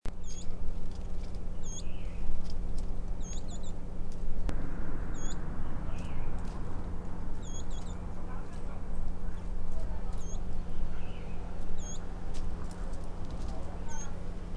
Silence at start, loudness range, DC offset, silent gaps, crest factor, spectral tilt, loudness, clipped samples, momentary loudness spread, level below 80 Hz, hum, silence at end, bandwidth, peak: 0.05 s; 2 LU; under 0.1%; none; 14 dB; -5.5 dB/octave; -42 LUFS; under 0.1%; 3 LU; -34 dBFS; none; 0 s; 7.6 kHz; -14 dBFS